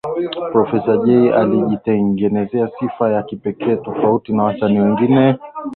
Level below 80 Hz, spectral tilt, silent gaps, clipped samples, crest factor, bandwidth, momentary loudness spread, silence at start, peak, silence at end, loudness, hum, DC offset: -52 dBFS; -10.5 dB/octave; none; under 0.1%; 14 dB; 4.3 kHz; 8 LU; 0.05 s; -2 dBFS; 0 s; -16 LUFS; none; under 0.1%